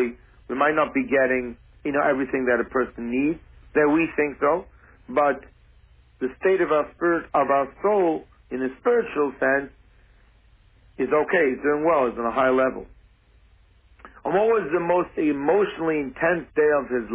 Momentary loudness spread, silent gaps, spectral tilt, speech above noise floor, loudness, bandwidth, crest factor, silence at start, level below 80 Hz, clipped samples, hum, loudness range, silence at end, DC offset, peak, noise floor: 9 LU; none; -10 dB/octave; 34 dB; -23 LUFS; 3.9 kHz; 16 dB; 0 s; -54 dBFS; under 0.1%; none; 2 LU; 0 s; under 0.1%; -8 dBFS; -56 dBFS